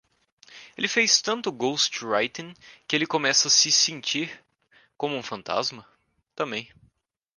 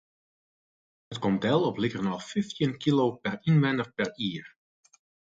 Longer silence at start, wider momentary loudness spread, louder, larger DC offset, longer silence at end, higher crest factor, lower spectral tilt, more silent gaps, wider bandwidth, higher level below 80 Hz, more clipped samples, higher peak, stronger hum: second, 0.5 s vs 1.1 s; first, 16 LU vs 9 LU; first, -23 LUFS vs -28 LUFS; neither; second, 0.7 s vs 0.85 s; about the same, 22 dB vs 18 dB; second, -1 dB/octave vs -7 dB/octave; neither; first, 11.5 kHz vs 7.8 kHz; second, -72 dBFS vs -64 dBFS; neither; first, -6 dBFS vs -12 dBFS; neither